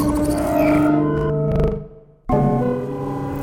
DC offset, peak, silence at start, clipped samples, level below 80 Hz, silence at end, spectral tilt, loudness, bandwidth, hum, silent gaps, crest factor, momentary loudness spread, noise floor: under 0.1%; -4 dBFS; 0 s; under 0.1%; -32 dBFS; 0 s; -8 dB/octave; -19 LUFS; 16.5 kHz; none; none; 14 dB; 9 LU; -38 dBFS